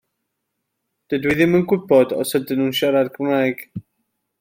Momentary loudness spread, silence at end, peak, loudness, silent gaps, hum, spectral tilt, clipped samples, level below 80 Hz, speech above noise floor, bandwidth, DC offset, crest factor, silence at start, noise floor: 11 LU; 0.6 s; -2 dBFS; -18 LUFS; none; none; -5.5 dB/octave; under 0.1%; -56 dBFS; 59 dB; 16.5 kHz; under 0.1%; 18 dB; 1.1 s; -77 dBFS